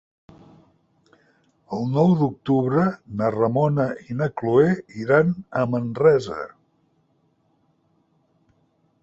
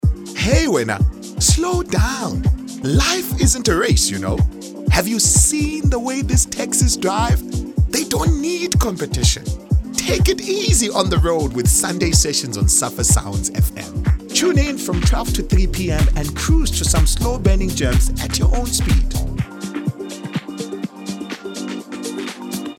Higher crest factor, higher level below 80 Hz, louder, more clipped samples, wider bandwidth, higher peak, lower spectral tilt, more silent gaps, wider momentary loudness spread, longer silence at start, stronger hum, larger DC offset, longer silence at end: about the same, 20 dB vs 18 dB; second, -60 dBFS vs -22 dBFS; second, -21 LUFS vs -18 LUFS; neither; second, 7.8 kHz vs 18 kHz; second, -4 dBFS vs 0 dBFS; first, -9 dB/octave vs -4 dB/octave; neither; about the same, 9 LU vs 11 LU; first, 1.7 s vs 0.05 s; neither; neither; first, 2.55 s vs 0.05 s